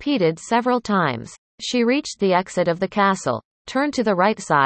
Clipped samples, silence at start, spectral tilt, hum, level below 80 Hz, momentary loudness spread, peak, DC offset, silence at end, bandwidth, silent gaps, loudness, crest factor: under 0.1%; 0 s; -5 dB/octave; none; -58 dBFS; 8 LU; -4 dBFS; under 0.1%; 0 s; 8.8 kHz; 1.38-1.58 s, 3.45-3.65 s; -21 LUFS; 16 dB